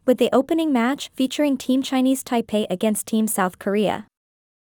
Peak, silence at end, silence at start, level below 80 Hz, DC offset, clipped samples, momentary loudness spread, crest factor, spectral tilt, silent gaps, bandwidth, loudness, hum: -6 dBFS; 0.7 s; 0.05 s; -64 dBFS; under 0.1%; under 0.1%; 5 LU; 16 dB; -4.5 dB/octave; none; 19.5 kHz; -21 LUFS; none